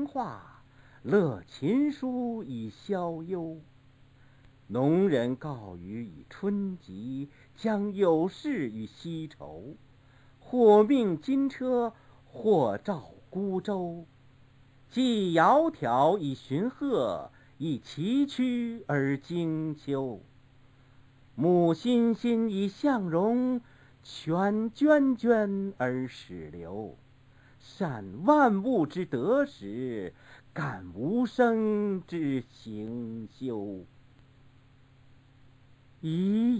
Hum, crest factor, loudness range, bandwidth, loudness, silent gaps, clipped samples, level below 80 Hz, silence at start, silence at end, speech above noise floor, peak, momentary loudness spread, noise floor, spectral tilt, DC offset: none; 20 dB; 5 LU; 8 kHz; -29 LUFS; none; under 0.1%; -64 dBFS; 0 s; 0 s; 30 dB; -10 dBFS; 17 LU; -58 dBFS; -7.5 dB/octave; under 0.1%